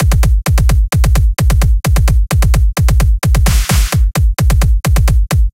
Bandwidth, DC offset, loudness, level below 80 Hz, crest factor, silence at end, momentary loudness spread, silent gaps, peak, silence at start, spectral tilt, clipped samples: 16.5 kHz; under 0.1%; -13 LUFS; -10 dBFS; 10 dB; 0.05 s; 1 LU; none; 0 dBFS; 0 s; -5 dB/octave; under 0.1%